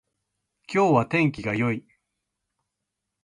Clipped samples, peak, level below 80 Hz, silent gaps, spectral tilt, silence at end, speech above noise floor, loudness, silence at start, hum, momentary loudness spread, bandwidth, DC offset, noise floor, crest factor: under 0.1%; -8 dBFS; -60 dBFS; none; -7.5 dB/octave; 1.45 s; 61 dB; -24 LUFS; 0.7 s; none; 8 LU; 11.5 kHz; under 0.1%; -83 dBFS; 18 dB